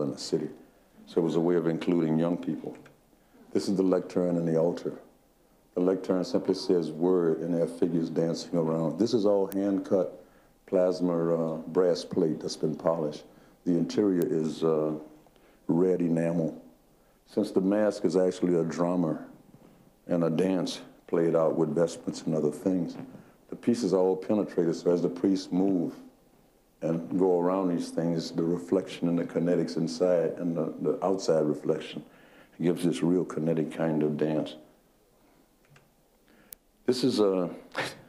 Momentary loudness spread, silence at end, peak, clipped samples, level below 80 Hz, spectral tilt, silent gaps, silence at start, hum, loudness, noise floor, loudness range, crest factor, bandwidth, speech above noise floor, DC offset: 9 LU; 0.1 s; -10 dBFS; under 0.1%; -70 dBFS; -7 dB/octave; none; 0 s; none; -28 LUFS; -64 dBFS; 2 LU; 18 dB; 15.5 kHz; 37 dB; under 0.1%